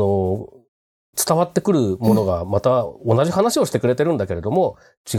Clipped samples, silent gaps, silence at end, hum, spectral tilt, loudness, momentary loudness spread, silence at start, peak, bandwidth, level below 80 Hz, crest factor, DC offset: under 0.1%; 0.68-1.13 s, 4.97-5.04 s; 0 s; none; -6 dB/octave; -19 LUFS; 6 LU; 0 s; -2 dBFS; 17 kHz; -48 dBFS; 16 dB; under 0.1%